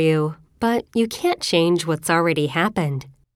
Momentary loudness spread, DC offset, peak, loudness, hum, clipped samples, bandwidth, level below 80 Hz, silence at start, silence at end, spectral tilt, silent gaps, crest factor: 7 LU; under 0.1%; -4 dBFS; -21 LUFS; none; under 0.1%; 16.5 kHz; -56 dBFS; 0 s; 0.25 s; -5 dB/octave; none; 16 dB